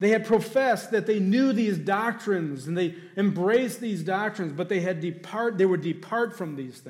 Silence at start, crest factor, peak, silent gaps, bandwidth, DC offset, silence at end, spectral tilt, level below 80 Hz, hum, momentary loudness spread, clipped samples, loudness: 0 s; 14 dB; -12 dBFS; none; 16 kHz; under 0.1%; 0 s; -6.5 dB/octave; -74 dBFS; none; 8 LU; under 0.1%; -26 LUFS